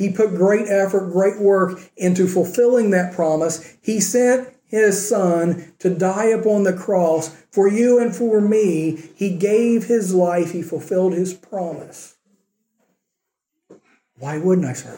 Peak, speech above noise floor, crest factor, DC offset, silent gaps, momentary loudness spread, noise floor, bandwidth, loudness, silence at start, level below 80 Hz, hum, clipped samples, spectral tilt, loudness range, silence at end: -4 dBFS; 62 dB; 14 dB; under 0.1%; none; 9 LU; -80 dBFS; 17 kHz; -18 LUFS; 0 s; -70 dBFS; none; under 0.1%; -6 dB/octave; 9 LU; 0 s